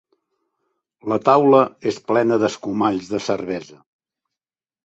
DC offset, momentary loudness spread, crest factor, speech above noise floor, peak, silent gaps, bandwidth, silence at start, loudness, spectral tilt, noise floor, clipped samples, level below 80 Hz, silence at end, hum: under 0.1%; 12 LU; 18 dB; over 72 dB; -2 dBFS; none; 8 kHz; 1.05 s; -19 LUFS; -6 dB/octave; under -90 dBFS; under 0.1%; -62 dBFS; 1.2 s; none